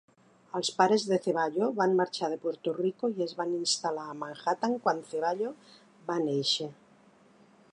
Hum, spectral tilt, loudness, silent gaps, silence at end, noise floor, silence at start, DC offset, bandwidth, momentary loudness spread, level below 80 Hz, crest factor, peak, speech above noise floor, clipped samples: none; -4 dB/octave; -30 LUFS; none; 1 s; -60 dBFS; 0.55 s; under 0.1%; 11 kHz; 9 LU; -82 dBFS; 20 dB; -10 dBFS; 31 dB; under 0.1%